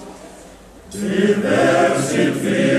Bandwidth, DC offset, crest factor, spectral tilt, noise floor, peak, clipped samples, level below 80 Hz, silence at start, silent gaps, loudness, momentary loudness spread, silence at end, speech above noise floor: 14 kHz; under 0.1%; 14 dB; -5 dB/octave; -41 dBFS; -4 dBFS; under 0.1%; -52 dBFS; 0 s; none; -17 LUFS; 20 LU; 0 s; 25 dB